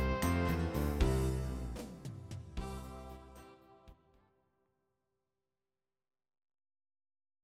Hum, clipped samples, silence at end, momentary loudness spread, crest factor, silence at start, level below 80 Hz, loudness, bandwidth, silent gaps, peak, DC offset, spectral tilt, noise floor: none; under 0.1%; 3.5 s; 18 LU; 22 dB; 0 s; -44 dBFS; -37 LUFS; 16.5 kHz; none; -18 dBFS; under 0.1%; -6.5 dB/octave; under -90 dBFS